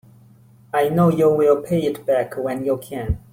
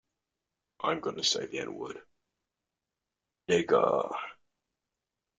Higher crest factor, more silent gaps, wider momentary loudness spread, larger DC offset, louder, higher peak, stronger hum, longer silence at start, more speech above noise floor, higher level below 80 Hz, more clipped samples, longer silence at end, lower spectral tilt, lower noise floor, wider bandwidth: second, 16 dB vs 22 dB; neither; second, 9 LU vs 17 LU; neither; first, -20 LUFS vs -30 LUFS; first, -4 dBFS vs -12 dBFS; neither; about the same, 0.75 s vs 0.8 s; second, 31 dB vs 59 dB; first, -40 dBFS vs -74 dBFS; neither; second, 0.15 s vs 1.05 s; first, -7.5 dB/octave vs -3 dB/octave; second, -49 dBFS vs -88 dBFS; first, 16.5 kHz vs 9.4 kHz